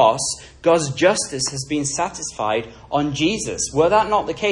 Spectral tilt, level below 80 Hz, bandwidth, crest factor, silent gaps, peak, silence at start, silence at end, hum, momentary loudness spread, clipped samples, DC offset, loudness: -3.5 dB/octave; -48 dBFS; 11.5 kHz; 18 dB; none; -2 dBFS; 0 s; 0 s; none; 8 LU; under 0.1%; under 0.1%; -20 LUFS